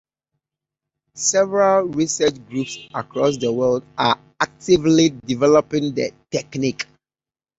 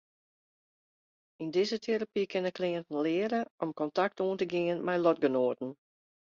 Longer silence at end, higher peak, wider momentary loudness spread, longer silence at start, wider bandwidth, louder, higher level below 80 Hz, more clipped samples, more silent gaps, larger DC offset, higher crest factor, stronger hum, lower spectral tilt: about the same, 0.75 s vs 0.65 s; first, -2 dBFS vs -16 dBFS; first, 11 LU vs 7 LU; second, 1.15 s vs 1.4 s; about the same, 8 kHz vs 7.4 kHz; first, -19 LUFS vs -31 LUFS; first, -56 dBFS vs -78 dBFS; neither; second, none vs 3.50-3.58 s; neither; about the same, 18 dB vs 18 dB; neither; second, -4 dB/octave vs -6 dB/octave